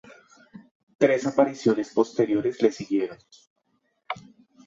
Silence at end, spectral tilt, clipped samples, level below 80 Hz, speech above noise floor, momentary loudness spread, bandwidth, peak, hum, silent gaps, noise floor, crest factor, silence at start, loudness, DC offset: 0.45 s; -6 dB/octave; under 0.1%; -70 dBFS; 49 dB; 15 LU; 7.8 kHz; -4 dBFS; none; 0.71-0.87 s, 0.95-0.99 s, 3.47-3.56 s; -72 dBFS; 22 dB; 0.55 s; -24 LUFS; under 0.1%